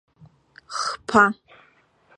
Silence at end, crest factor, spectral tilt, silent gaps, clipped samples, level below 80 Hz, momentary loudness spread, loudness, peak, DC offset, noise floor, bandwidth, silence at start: 0.85 s; 24 dB; -3.5 dB/octave; none; under 0.1%; -60 dBFS; 16 LU; -21 LUFS; -2 dBFS; under 0.1%; -59 dBFS; 11.5 kHz; 0.7 s